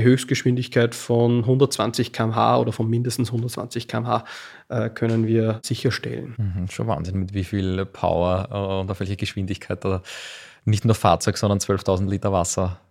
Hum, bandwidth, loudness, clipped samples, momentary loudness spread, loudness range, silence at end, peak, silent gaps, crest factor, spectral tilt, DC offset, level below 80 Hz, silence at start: none; 15.5 kHz; -23 LUFS; under 0.1%; 9 LU; 4 LU; 0.15 s; -2 dBFS; none; 20 dB; -6 dB/octave; under 0.1%; -50 dBFS; 0 s